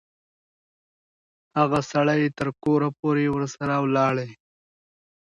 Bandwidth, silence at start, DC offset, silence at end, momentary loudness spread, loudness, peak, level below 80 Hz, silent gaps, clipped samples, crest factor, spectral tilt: 10.5 kHz; 1.55 s; under 0.1%; 0.9 s; 6 LU; -23 LUFS; -6 dBFS; -60 dBFS; 2.99-3.03 s; under 0.1%; 18 dB; -7 dB/octave